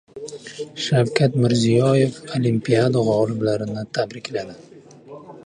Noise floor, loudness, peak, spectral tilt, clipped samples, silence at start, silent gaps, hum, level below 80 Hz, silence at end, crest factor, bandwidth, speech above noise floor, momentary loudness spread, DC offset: -41 dBFS; -20 LUFS; -2 dBFS; -6.5 dB/octave; under 0.1%; 0.15 s; none; none; -58 dBFS; 0.05 s; 18 dB; 10.5 kHz; 21 dB; 18 LU; under 0.1%